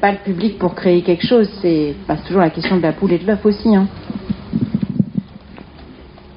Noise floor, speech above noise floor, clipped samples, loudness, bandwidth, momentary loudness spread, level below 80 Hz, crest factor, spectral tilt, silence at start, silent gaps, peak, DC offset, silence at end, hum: -38 dBFS; 23 dB; under 0.1%; -17 LUFS; 5.4 kHz; 9 LU; -42 dBFS; 16 dB; -6 dB/octave; 0 s; none; -2 dBFS; under 0.1%; 0 s; none